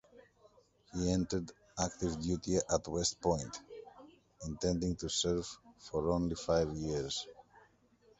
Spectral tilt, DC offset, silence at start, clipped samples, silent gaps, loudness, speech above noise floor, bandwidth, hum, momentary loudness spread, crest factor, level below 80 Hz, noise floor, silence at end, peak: -4.5 dB/octave; under 0.1%; 0.15 s; under 0.1%; none; -36 LUFS; 33 dB; 8.2 kHz; none; 15 LU; 22 dB; -52 dBFS; -68 dBFS; 0.8 s; -16 dBFS